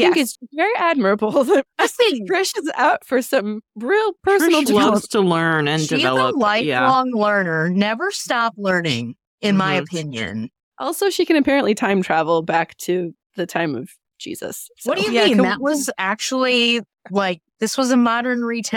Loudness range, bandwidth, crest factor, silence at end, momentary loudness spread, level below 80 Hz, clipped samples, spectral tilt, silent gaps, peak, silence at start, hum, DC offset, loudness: 4 LU; 18 kHz; 14 dB; 0 s; 10 LU; -62 dBFS; under 0.1%; -4.5 dB/octave; 9.27-9.38 s, 10.63-10.72 s, 13.26-13.30 s; -4 dBFS; 0 s; none; under 0.1%; -18 LUFS